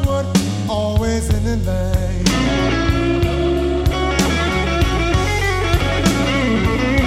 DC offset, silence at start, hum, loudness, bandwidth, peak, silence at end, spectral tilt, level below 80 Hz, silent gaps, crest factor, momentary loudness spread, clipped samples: under 0.1%; 0 s; none; -17 LUFS; 16 kHz; -2 dBFS; 0 s; -5.5 dB/octave; -22 dBFS; none; 14 dB; 3 LU; under 0.1%